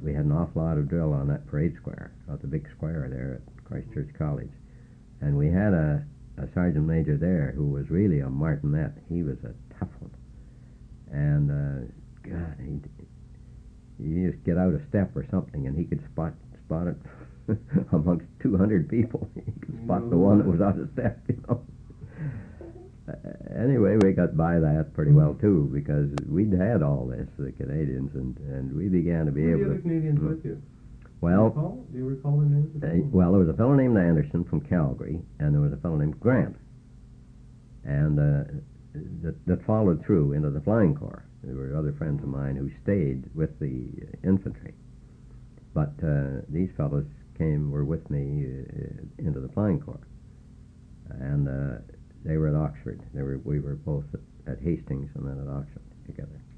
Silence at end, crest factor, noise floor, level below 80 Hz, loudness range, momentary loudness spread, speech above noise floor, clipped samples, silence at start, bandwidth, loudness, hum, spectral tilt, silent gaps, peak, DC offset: 0.05 s; 20 dB; -49 dBFS; -42 dBFS; 8 LU; 17 LU; 24 dB; under 0.1%; 0 s; 3.3 kHz; -27 LUFS; none; -11 dB/octave; none; -8 dBFS; under 0.1%